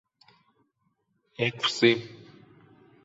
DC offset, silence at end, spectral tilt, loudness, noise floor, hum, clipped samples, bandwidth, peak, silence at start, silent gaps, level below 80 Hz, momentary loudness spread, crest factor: under 0.1%; 0.9 s; -4.5 dB/octave; -25 LUFS; -74 dBFS; none; under 0.1%; 8 kHz; -6 dBFS; 1.4 s; none; -74 dBFS; 24 LU; 24 dB